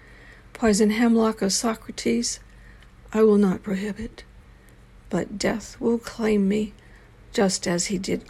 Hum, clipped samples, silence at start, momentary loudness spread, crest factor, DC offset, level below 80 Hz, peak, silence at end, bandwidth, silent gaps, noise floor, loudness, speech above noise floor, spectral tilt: none; under 0.1%; 0.1 s; 11 LU; 16 dB; under 0.1%; -48 dBFS; -8 dBFS; 0.05 s; 14.5 kHz; none; -50 dBFS; -23 LUFS; 27 dB; -4.5 dB/octave